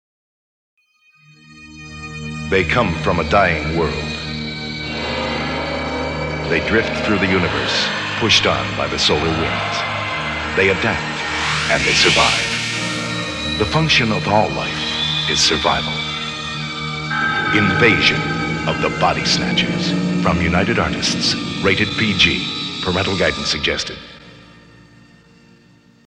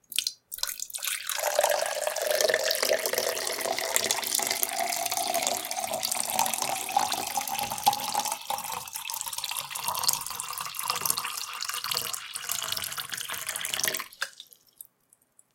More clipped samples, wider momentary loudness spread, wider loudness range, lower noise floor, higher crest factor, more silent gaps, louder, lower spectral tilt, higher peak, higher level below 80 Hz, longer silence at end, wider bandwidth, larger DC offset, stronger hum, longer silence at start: neither; about the same, 10 LU vs 8 LU; about the same, 4 LU vs 4 LU; second, -54 dBFS vs -66 dBFS; second, 18 dB vs 30 dB; neither; first, -17 LUFS vs -28 LUFS; first, -4 dB/octave vs 0.5 dB/octave; about the same, 0 dBFS vs 0 dBFS; first, -38 dBFS vs -72 dBFS; first, 1.55 s vs 1.1 s; second, 12 kHz vs 17 kHz; neither; neither; first, 1.5 s vs 0.1 s